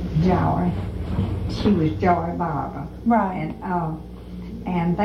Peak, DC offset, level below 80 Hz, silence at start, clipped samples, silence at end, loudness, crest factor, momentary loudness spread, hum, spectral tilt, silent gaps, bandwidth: -6 dBFS; under 0.1%; -36 dBFS; 0 s; under 0.1%; 0 s; -23 LUFS; 18 dB; 12 LU; 60 Hz at -35 dBFS; -9 dB/octave; none; 6.8 kHz